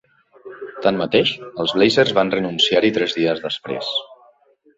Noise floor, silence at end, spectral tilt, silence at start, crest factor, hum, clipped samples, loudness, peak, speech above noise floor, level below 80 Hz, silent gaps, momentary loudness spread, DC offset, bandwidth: -55 dBFS; 0.65 s; -4.5 dB/octave; 0.45 s; 18 dB; none; under 0.1%; -18 LUFS; -2 dBFS; 37 dB; -58 dBFS; none; 10 LU; under 0.1%; 8 kHz